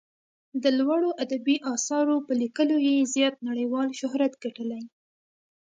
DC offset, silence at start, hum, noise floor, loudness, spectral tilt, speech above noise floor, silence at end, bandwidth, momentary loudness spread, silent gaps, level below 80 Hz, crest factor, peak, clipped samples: under 0.1%; 0.55 s; none; under -90 dBFS; -26 LUFS; -2.5 dB/octave; over 65 dB; 0.9 s; 9.4 kHz; 11 LU; none; -80 dBFS; 16 dB; -10 dBFS; under 0.1%